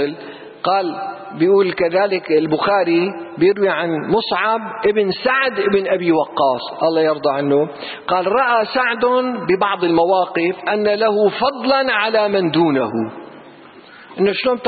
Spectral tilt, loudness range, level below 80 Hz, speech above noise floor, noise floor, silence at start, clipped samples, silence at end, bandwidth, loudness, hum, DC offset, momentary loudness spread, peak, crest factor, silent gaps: -10.5 dB/octave; 1 LU; -58 dBFS; 25 dB; -41 dBFS; 0 s; under 0.1%; 0 s; 4.8 kHz; -17 LUFS; none; under 0.1%; 7 LU; -4 dBFS; 12 dB; none